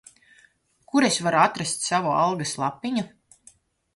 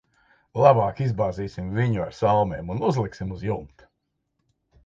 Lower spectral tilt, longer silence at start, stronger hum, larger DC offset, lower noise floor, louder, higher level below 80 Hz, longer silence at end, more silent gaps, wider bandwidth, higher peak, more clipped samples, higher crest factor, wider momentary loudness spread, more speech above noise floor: second, -3.5 dB/octave vs -8 dB/octave; first, 0.95 s vs 0.55 s; neither; neither; second, -60 dBFS vs -77 dBFS; about the same, -23 LUFS vs -24 LUFS; second, -66 dBFS vs -48 dBFS; second, 0.9 s vs 1.2 s; neither; first, 11.5 kHz vs 7.6 kHz; second, -6 dBFS vs -2 dBFS; neither; about the same, 20 dB vs 22 dB; second, 8 LU vs 13 LU; second, 37 dB vs 54 dB